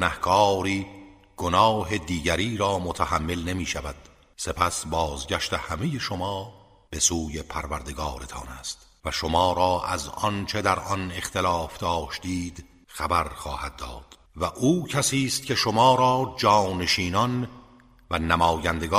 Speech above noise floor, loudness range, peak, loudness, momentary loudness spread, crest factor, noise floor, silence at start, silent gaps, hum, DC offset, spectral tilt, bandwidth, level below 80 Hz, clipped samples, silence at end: 28 dB; 6 LU; -4 dBFS; -25 LUFS; 14 LU; 22 dB; -53 dBFS; 0 s; none; none; under 0.1%; -4 dB/octave; 15.5 kHz; -42 dBFS; under 0.1%; 0 s